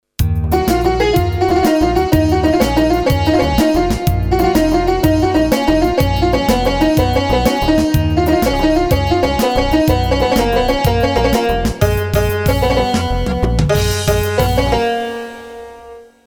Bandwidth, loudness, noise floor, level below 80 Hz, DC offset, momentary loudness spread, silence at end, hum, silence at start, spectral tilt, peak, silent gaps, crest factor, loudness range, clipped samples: over 20 kHz; -14 LUFS; -37 dBFS; -22 dBFS; under 0.1%; 3 LU; 0.25 s; none; 0.2 s; -6 dB/octave; 0 dBFS; none; 14 dB; 2 LU; under 0.1%